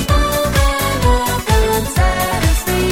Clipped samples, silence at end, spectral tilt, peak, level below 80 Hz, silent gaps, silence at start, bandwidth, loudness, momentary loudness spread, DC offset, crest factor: under 0.1%; 0 s; -4.5 dB/octave; 0 dBFS; -18 dBFS; none; 0 s; 17.5 kHz; -15 LUFS; 1 LU; under 0.1%; 14 dB